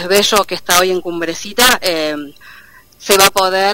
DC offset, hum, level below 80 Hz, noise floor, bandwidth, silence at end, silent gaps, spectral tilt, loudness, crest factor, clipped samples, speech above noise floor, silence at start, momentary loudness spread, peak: under 0.1%; none; -44 dBFS; -42 dBFS; over 20 kHz; 0 s; none; -1.5 dB/octave; -12 LUFS; 14 dB; 0.2%; 28 dB; 0 s; 12 LU; 0 dBFS